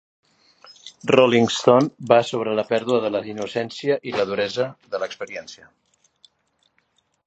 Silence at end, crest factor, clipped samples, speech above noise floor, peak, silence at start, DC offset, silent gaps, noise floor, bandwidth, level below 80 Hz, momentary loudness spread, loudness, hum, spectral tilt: 1.7 s; 22 dB; under 0.1%; 47 dB; 0 dBFS; 0.85 s; under 0.1%; none; -67 dBFS; 8.4 kHz; -66 dBFS; 16 LU; -21 LUFS; none; -5 dB/octave